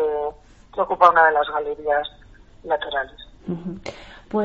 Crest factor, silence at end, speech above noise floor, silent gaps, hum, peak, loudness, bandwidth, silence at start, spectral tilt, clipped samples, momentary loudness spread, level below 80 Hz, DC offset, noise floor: 22 dB; 0 s; 19 dB; none; none; 0 dBFS; -21 LUFS; 8 kHz; 0 s; -2.5 dB/octave; under 0.1%; 21 LU; -50 dBFS; under 0.1%; -40 dBFS